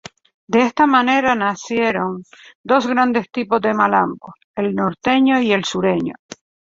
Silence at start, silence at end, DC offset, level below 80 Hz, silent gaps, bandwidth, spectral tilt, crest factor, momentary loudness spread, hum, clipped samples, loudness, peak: 0.5 s; 0.6 s; under 0.1%; -58 dBFS; 2.55-2.64 s, 4.44-4.54 s; 7.8 kHz; -5 dB/octave; 16 dB; 12 LU; none; under 0.1%; -17 LUFS; -2 dBFS